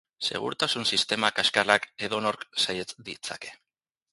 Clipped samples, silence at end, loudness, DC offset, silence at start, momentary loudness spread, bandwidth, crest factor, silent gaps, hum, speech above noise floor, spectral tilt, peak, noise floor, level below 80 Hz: under 0.1%; 0.6 s; -26 LUFS; under 0.1%; 0.2 s; 14 LU; 12 kHz; 26 dB; none; none; 59 dB; -2 dB/octave; -2 dBFS; -87 dBFS; -66 dBFS